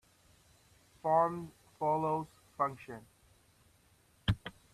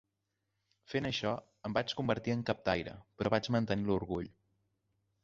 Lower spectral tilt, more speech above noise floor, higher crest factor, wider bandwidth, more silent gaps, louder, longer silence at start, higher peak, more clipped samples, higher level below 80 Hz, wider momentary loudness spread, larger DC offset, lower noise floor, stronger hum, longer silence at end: first, -7 dB/octave vs -4.5 dB/octave; second, 35 dB vs 50 dB; about the same, 22 dB vs 22 dB; first, 14 kHz vs 7.6 kHz; neither; about the same, -35 LUFS vs -35 LUFS; first, 1.05 s vs 0.9 s; about the same, -16 dBFS vs -14 dBFS; neither; about the same, -56 dBFS vs -60 dBFS; first, 19 LU vs 8 LU; neither; second, -68 dBFS vs -85 dBFS; neither; second, 0.25 s vs 0.95 s